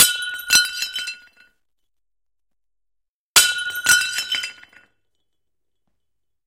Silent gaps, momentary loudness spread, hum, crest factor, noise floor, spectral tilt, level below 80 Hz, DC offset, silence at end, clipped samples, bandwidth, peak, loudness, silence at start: 3.08-3.35 s; 15 LU; none; 24 dB; -86 dBFS; 2.5 dB/octave; -60 dBFS; under 0.1%; 1.95 s; under 0.1%; 17 kHz; 0 dBFS; -17 LUFS; 0 s